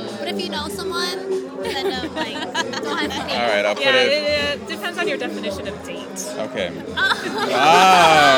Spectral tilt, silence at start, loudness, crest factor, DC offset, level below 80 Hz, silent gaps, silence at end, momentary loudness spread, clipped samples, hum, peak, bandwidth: -3 dB/octave; 0 s; -19 LUFS; 18 dB; under 0.1%; -52 dBFS; none; 0 s; 14 LU; under 0.1%; none; -2 dBFS; 19 kHz